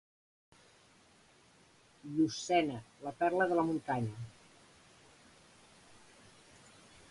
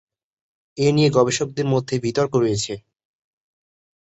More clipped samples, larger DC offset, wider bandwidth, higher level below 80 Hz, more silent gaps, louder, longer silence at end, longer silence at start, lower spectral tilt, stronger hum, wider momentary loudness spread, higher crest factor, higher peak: neither; neither; first, 11.5 kHz vs 8.4 kHz; second, -72 dBFS vs -56 dBFS; neither; second, -34 LUFS vs -20 LUFS; first, 2.8 s vs 1.25 s; first, 2.05 s vs 0.75 s; about the same, -5.5 dB/octave vs -5.5 dB/octave; neither; first, 27 LU vs 11 LU; about the same, 22 dB vs 18 dB; second, -16 dBFS vs -4 dBFS